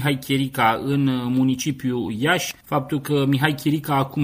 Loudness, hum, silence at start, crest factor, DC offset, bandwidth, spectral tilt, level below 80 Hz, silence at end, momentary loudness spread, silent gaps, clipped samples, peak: -21 LUFS; none; 0 s; 18 dB; under 0.1%; 16 kHz; -5.5 dB/octave; -54 dBFS; 0 s; 5 LU; none; under 0.1%; -2 dBFS